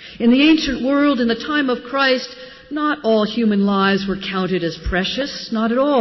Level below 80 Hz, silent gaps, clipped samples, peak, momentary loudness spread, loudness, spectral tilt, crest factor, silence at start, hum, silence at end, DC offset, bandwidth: -40 dBFS; none; under 0.1%; -4 dBFS; 8 LU; -18 LUFS; -6 dB/octave; 14 dB; 0 s; none; 0 s; under 0.1%; 6.2 kHz